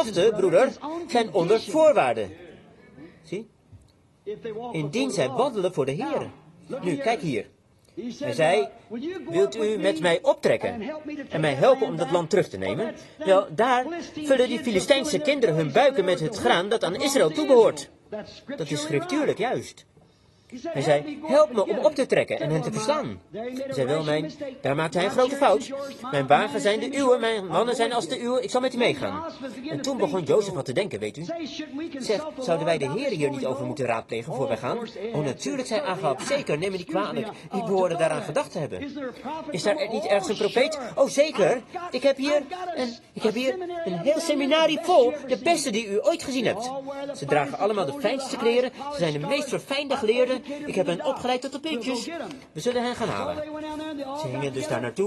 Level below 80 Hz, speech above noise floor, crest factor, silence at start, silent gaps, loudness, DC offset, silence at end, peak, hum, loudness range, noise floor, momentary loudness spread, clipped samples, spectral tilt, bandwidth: -62 dBFS; 33 dB; 22 dB; 0 s; none; -25 LUFS; under 0.1%; 0 s; -4 dBFS; none; 5 LU; -58 dBFS; 13 LU; under 0.1%; -4.5 dB/octave; 12.5 kHz